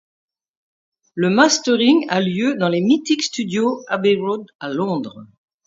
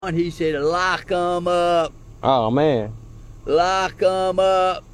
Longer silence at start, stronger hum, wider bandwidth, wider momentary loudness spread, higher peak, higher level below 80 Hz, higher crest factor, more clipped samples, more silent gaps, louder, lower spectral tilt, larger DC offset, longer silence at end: first, 1.15 s vs 0 s; neither; second, 7.8 kHz vs 12 kHz; first, 11 LU vs 7 LU; first, 0 dBFS vs -4 dBFS; second, -66 dBFS vs -44 dBFS; about the same, 18 dB vs 16 dB; neither; first, 4.55-4.59 s vs none; about the same, -18 LUFS vs -20 LUFS; about the same, -4.5 dB/octave vs -5.5 dB/octave; neither; first, 0.4 s vs 0.05 s